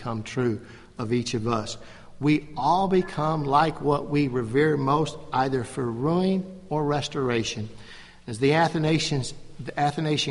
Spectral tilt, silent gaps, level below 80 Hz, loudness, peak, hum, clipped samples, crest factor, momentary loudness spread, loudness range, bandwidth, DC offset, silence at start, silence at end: -6 dB/octave; none; -50 dBFS; -25 LUFS; -8 dBFS; none; under 0.1%; 18 dB; 14 LU; 3 LU; 11.5 kHz; under 0.1%; 0 s; 0 s